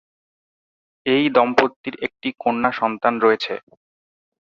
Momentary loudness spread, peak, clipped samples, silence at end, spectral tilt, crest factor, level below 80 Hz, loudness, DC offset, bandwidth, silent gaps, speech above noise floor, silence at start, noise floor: 12 LU; -2 dBFS; under 0.1%; 0.9 s; -5.5 dB/octave; 20 dB; -64 dBFS; -20 LUFS; under 0.1%; 7.2 kHz; 1.76-1.84 s; over 70 dB; 1.05 s; under -90 dBFS